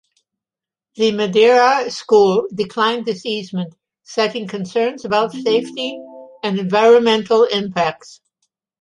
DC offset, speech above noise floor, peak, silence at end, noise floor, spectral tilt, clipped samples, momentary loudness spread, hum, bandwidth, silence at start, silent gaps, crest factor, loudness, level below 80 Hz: under 0.1%; 73 dB; -2 dBFS; 0.65 s; -89 dBFS; -5 dB/octave; under 0.1%; 15 LU; none; 10.5 kHz; 1 s; none; 16 dB; -17 LUFS; -64 dBFS